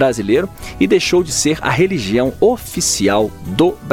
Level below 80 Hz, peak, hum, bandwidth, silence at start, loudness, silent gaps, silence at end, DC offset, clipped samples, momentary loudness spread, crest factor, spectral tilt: -38 dBFS; -2 dBFS; none; 17 kHz; 0 s; -15 LUFS; none; 0 s; under 0.1%; under 0.1%; 4 LU; 14 dB; -4 dB/octave